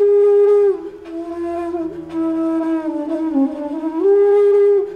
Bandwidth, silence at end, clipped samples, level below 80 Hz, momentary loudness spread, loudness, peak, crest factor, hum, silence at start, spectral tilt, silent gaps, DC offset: 4.3 kHz; 0 s; under 0.1%; -56 dBFS; 13 LU; -16 LUFS; -6 dBFS; 10 dB; none; 0 s; -7.5 dB/octave; none; under 0.1%